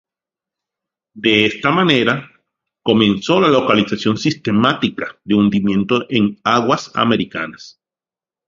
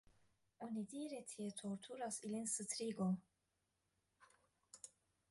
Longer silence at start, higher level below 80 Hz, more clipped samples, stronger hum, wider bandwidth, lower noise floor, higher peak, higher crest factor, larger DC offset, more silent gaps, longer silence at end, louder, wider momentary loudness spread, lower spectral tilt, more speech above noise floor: first, 1.15 s vs 0.6 s; first, -52 dBFS vs -84 dBFS; neither; neither; second, 7.6 kHz vs 11.5 kHz; about the same, under -90 dBFS vs -87 dBFS; first, 0 dBFS vs -30 dBFS; about the same, 16 dB vs 18 dB; neither; neither; first, 0.8 s vs 0.4 s; first, -16 LUFS vs -46 LUFS; second, 8 LU vs 16 LU; about the same, -5.5 dB/octave vs -4.5 dB/octave; first, over 74 dB vs 42 dB